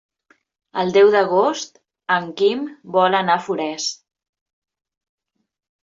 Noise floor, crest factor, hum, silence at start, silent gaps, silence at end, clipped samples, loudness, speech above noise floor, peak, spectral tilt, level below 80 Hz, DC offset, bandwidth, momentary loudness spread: -61 dBFS; 18 dB; none; 0.75 s; none; 1.9 s; under 0.1%; -18 LUFS; 43 dB; -4 dBFS; -4 dB/octave; -68 dBFS; under 0.1%; 7.6 kHz; 16 LU